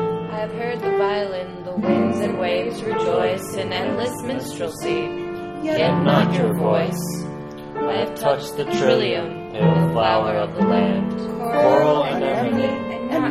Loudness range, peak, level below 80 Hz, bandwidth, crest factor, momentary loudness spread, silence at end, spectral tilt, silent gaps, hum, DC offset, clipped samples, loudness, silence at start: 4 LU; -2 dBFS; -52 dBFS; 14.5 kHz; 18 dB; 10 LU; 0 s; -6.5 dB/octave; none; none; under 0.1%; under 0.1%; -21 LUFS; 0 s